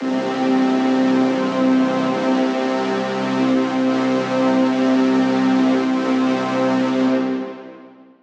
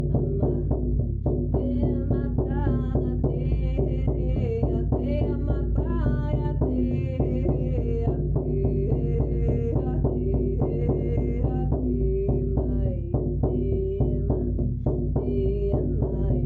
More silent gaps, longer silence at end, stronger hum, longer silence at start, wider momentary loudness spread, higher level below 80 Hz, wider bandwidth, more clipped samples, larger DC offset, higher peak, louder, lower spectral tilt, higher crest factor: neither; first, 0.35 s vs 0 s; neither; about the same, 0 s vs 0 s; about the same, 4 LU vs 2 LU; second, -70 dBFS vs -28 dBFS; first, 8 kHz vs 3.3 kHz; neither; neither; first, -6 dBFS vs -12 dBFS; first, -18 LUFS vs -26 LUFS; second, -6 dB/octave vs -12 dB/octave; about the same, 12 dB vs 10 dB